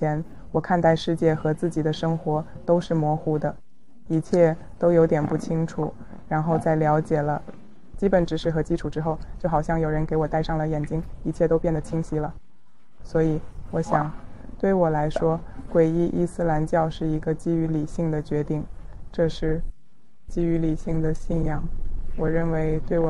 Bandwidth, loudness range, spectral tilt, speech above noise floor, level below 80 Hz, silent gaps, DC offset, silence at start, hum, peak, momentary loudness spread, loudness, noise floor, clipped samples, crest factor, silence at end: 11 kHz; 4 LU; -8 dB/octave; 40 dB; -34 dBFS; none; 1%; 0 s; none; -6 dBFS; 10 LU; -24 LUFS; -63 dBFS; under 0.1%; 18 dB; 0 s